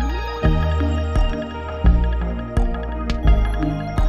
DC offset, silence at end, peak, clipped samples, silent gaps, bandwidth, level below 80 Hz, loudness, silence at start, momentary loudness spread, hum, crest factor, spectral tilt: under 0.1%; 0 s; -4 dBFS; under 0.1%; none; 7.8 kHz; -20 dBFS; -22 LUFS; 0 s; 6 LU; none; 16 dB; -7.5 dB/octave